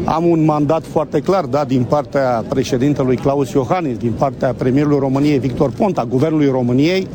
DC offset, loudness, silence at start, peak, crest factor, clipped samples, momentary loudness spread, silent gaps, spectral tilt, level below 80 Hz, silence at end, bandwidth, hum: under 0.1%; -16 LUFS; 0 s; -2 dBFS; 12 dB; under 0.1%; 4 LU; none; -7.5 dB/octave; -42 dBFS; 0 s; 18.5 kHz; none